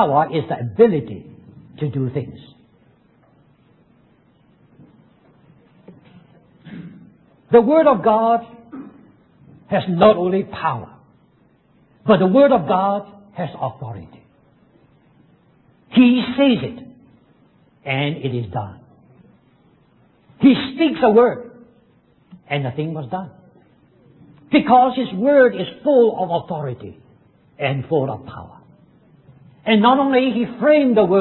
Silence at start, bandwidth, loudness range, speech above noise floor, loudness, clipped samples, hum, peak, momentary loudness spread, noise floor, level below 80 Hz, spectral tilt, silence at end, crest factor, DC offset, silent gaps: 0 s; 4.3 kHz; 11 LU; 40 dB; -17 LUFS; under 0.1%; none; 0 dBFS; 21 LU; -56 dBFS; -54 dBFS; -11 dB/octave; 0 s; 20 dB; under 0.1%; none